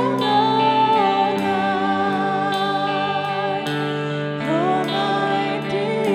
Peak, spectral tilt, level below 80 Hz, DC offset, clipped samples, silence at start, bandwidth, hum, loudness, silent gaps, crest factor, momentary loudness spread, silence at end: -6 dBFS; -6 dB/octave; -66 dBFS; under 0.1%; under 0.1%; 0 s; 15 kHz; none; -20 LUFS; none; 14 dB; 6 LU; 0 s